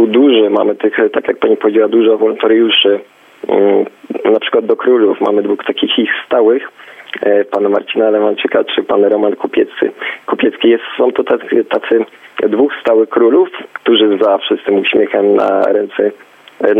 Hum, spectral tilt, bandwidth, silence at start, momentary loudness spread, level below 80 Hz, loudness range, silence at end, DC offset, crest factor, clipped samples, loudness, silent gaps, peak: none; -6.5 dB/octave; 3.9 kHz; 0 s; 7 LU; -60 dBFS; 2 LU; 0 s; under 0.1%; 12 dB; under 0.1%; -12 LUFS; none; 0 dBFS